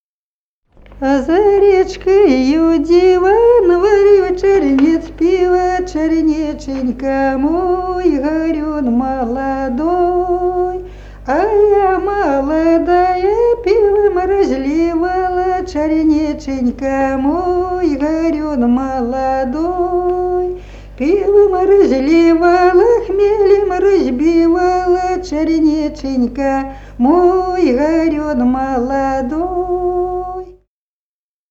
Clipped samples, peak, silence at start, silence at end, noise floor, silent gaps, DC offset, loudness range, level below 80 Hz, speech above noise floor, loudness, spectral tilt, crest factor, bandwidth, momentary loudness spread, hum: under 0.1%; 0 dBFS; 0.9 s; 1 s; under -90 dBFS; none; under 0.1%; 5 LU; -34 dBFS; over 77 dB; -13 LUFS; -6.5 dB/octave; 12 dB; 7.8 kHz; 8 LU; 50 Hz at -35 dBFS